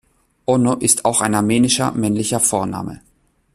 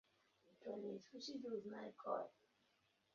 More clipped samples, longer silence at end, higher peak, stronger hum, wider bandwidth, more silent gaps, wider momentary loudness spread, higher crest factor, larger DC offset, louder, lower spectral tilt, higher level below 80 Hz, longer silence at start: neither; second, 0.6 s vs 0.85 s; first, 0 dBFS vs -30 dBFS; neither; first, 14 kHz vs 7 kHz; neither; first, 11 LU vs 7 LU; about the same, 18 dB vs 22 dB; neither; first, -16 LUFS vs -50 LUFS; about the same, -4 dB/octave vs -4 dB/octave; first, -50 dBFS vs under -90 dBFS; about the same, 0.5 s vs 0.45 s